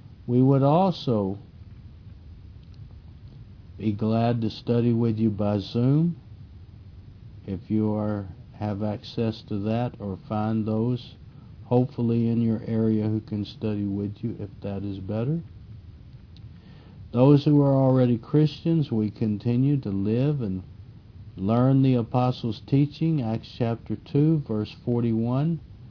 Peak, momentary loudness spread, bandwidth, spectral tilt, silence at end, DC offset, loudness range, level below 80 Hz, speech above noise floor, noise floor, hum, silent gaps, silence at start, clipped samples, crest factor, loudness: -6 dBFS; 14 LU; 5.4 kHz; -10 dB/octave; 0 s; under 0.1%; 8 LU; -52 dBFS; 22 dB; -46 dBFS; none; none; 0.1 s; under 0.1%; 20 dB; -25 LUFS